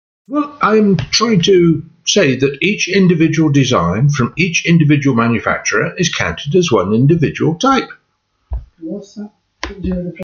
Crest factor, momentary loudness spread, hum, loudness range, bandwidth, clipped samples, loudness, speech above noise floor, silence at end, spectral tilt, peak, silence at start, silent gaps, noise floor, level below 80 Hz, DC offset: 14 dB; 17 LU; none; 4 LU; 7.2 kHz; under 0.1%; -13 LUFS; 51 dB; 0 s; -5 dB/octave; 0 dBFS; 0.3 s; none; -64 dBFS; -38 dBFS; under 0.1%